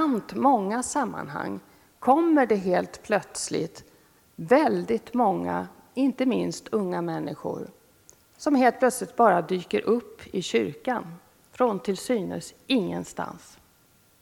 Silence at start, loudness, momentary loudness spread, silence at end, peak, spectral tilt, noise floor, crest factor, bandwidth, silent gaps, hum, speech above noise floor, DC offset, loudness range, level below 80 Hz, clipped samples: 0 s; -26 LUFS; 14 LU; 0.85 s; -6 dBFS; -5 dB/octave; -61 dBFS; 20 dB; 17 kHz; none; none; 36 dB; under 0.1%; 4 LU; -64 dBFS; under 0.1%